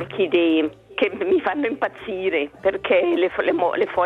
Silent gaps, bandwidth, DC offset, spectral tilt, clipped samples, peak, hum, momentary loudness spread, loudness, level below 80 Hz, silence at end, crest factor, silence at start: none; 4.7 kHz; under 0.1%; -7 dB/octave; under 0.1%; -4 dBFS; none; 7 LU; -21 LUFS; -58 dBFS; 0 s; 16 dB; 0 s